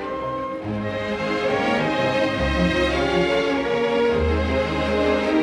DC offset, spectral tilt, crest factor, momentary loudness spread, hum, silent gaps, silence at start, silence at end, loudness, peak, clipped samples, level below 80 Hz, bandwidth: under 0.1%; -6 dB/octave; 14 dB; 7 LU; none; none; 0 s; 0 s; -21 LUFS; -8 dBFS; under 0.1%; -34 dBFS; 11.5 kHz